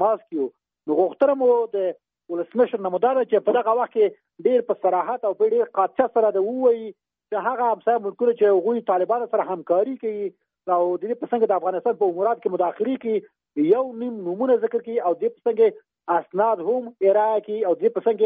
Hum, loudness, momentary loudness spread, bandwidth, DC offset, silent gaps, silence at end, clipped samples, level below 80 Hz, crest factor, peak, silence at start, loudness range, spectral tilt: none; -22 LUFS; 9 LU; 4.5 kHz; under 0.1%; none; 0 s; under 0.1%; -76 dBFS; 14 dB; -6 dBFS; 0 s; 2 LU; -5 dB/octave